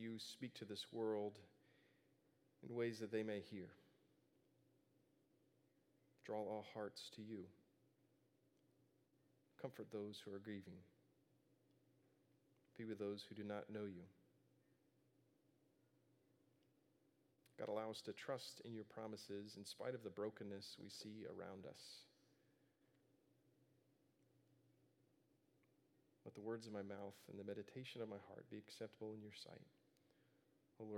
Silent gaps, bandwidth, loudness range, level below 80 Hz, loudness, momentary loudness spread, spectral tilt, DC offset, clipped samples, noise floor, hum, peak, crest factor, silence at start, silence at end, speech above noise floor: none; 16 kHz; 7 LU; under -90 dBFS; -52 LUFS; 13 LU; -5 dB/octave; under 0.1%; under 0.1%; -80 dBFS; none; -32 dBFS; 22 dB; 0 s; 0 s; 29 dB